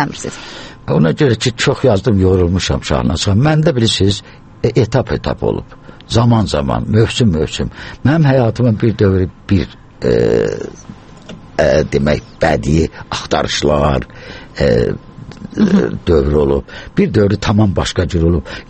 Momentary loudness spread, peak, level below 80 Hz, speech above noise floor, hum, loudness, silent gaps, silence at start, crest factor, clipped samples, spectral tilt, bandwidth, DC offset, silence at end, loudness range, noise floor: 12 LU; 0 dBFS; -30 dBFS; 21 dB; none; -14 LUFS; none; 0 s; 14 dB; under 0.1%; -6 dB/octave; 8.8 kHz; under 0.1%; 0.05 s; 3 LU; -34 dBFS